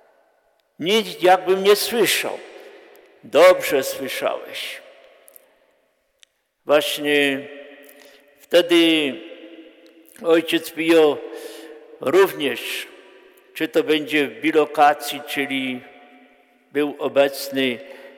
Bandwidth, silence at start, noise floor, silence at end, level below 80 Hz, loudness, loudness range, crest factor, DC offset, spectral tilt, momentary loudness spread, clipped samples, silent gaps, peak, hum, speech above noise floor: 19.5 kHz; 0.8 s; -65 dBFS; 0.1 s; -72 dBFS; -19 LUFS; 6 LU; 18 dB; under 0.1%; -3 dB/octave; 20 LU; under 0.1%; none; -4 dBFS; none; 46 dB